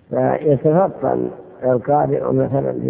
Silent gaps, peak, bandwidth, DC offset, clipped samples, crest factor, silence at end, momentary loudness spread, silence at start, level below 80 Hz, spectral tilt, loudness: none; -2 dBFS; 3.5 kHz; under 0.1%; under 0.1%; 16 dB; 0 s; 7 LU; 0.1 s; -50 dBFS; -13 dB/octave; -18 LUFS